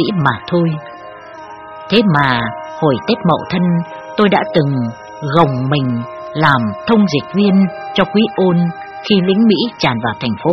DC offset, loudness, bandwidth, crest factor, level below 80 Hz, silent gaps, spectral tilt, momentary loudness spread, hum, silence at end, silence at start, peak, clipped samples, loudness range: under 0.1%; -14 LUFS; 6.4 kHz; 14 dB; -50 dBFS; none; -7.5 dB/octave; 13 LU; none; 0 s; 0 s; 0 dBFS; under 0.1%; 2 LU